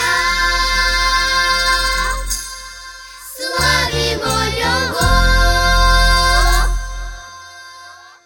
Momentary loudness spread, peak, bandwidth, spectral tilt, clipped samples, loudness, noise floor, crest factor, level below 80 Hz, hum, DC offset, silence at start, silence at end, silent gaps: 20 LU; 0 dBFS; 18.5 kHz; -2.5 dB/octave; under 0.1%; -14 LUFS; -39 dBFS; 16 dB; -20 dBFS; none; under 0.1%; 0 s; 0.3 s; none